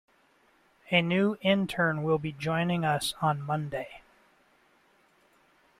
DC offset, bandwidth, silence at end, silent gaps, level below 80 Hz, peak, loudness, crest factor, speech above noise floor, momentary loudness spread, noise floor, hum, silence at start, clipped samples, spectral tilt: under 0.1%; 15.5 kHz; 1.8 s; none; -64 dBFS; -8 dBFS; -28 LUFS; 22 dB; 37 dB; 7 LU; -65 dBFS; none; 0.9 s; under 0.1%; -5.5 dB/octave